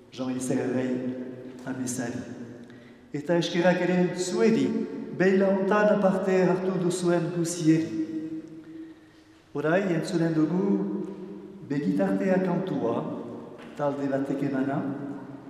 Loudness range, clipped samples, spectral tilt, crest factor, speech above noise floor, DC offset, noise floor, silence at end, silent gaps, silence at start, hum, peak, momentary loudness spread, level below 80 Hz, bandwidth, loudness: 5 LU; under 0.1%; -6 dB/octave; 18 dB; 29 dB; under 0.1%; -54 dBFS; 0 s; none; 0.15 s; none; -10 dBFS; 17 LU; -70 dBFS; 13 kHz; -26 LUFS